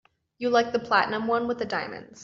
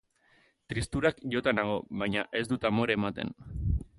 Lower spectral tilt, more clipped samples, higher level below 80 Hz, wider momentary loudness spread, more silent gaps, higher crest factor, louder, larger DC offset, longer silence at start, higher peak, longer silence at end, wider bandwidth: second, -2 dB/octave vs -6 dB/octave; neither; second, -66 dBFS vs -42 dBFS; about the same, 8 LU vs 9 LU; neither; about the same, 20 dB vs 20 dB; first, -25 LUFS vs -31 LUFS; neither; second, 0.4 s vs 0.7 s; about the same, -8 dBFS vs -10 dBFS; second, 0 s vs 0.15 s; second, 7.6 kHz vs 11.5 kHz